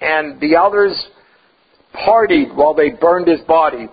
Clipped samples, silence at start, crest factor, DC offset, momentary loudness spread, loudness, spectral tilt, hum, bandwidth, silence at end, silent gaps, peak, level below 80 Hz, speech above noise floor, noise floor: under 0.1%; 0 s; 14 dB; under 0.1%; 8 LU; -13 LUFS; -8.5 dB/octave; none; 5 kHz; 0.05 s; none; 0 dBFS; -50 dBFS; 41 dB; -54 dBFS